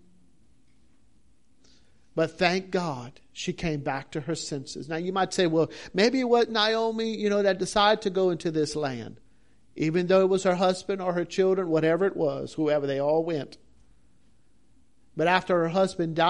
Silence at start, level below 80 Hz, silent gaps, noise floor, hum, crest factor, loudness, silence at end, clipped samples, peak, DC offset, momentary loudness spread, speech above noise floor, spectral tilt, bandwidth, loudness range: 2.15 s; -58 dBFS; none; -65 dBFS; none; 22 dB; -26 LUFS; 0 s; under 0.1%; -6 dBFS; 0.2%; 11 LU; 40 dB; -5 dB/octave; 11.5 kHz; 6 LU